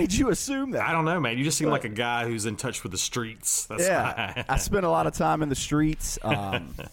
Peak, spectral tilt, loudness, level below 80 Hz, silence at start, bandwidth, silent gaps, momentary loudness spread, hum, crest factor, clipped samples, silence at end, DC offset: -12 dBFS; -4 dB/octave; -26 LUFS; -40 dBFS; 0 s; 17 kHz; none; 6 LU; none; 14 dB; under 0.1%; 0.05 s; under 0.1%